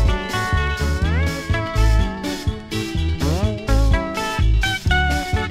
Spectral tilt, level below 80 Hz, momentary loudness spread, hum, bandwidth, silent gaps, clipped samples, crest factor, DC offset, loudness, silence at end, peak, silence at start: -5.5 dB/octave; -22 dBFS; 6 LU; none; 15 kHz; none; under 0.1%; 14 dB; under 0.1%; -21 LUFS; 0 s; -4 dBFS; 0 s